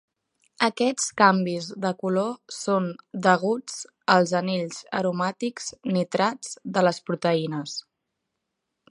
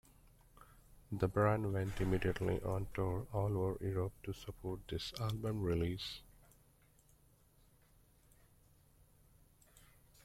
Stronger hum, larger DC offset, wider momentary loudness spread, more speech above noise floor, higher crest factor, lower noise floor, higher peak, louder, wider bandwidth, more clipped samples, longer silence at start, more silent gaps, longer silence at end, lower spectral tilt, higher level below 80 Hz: neither; neither; about the same, 11 LU vs 12 LU; first, 57 dB vs 31 dB; about the same, 22 dB vs 20 dB; first, -81 dBFS vs -69 dBFS; first, -2 dBFS vs -20 dBFS; first, -25 LUFS vs -39 LUFS; second, 11.5 kHz vs 15.5 kHz; neither; about the same, 0.6 s vs 0.6 s; neither; first, 1.1 s vs 0.45 s; second, -4.5 dB/octave vs -7 dB/octave; second, -72 dBFS vs -56 dBFS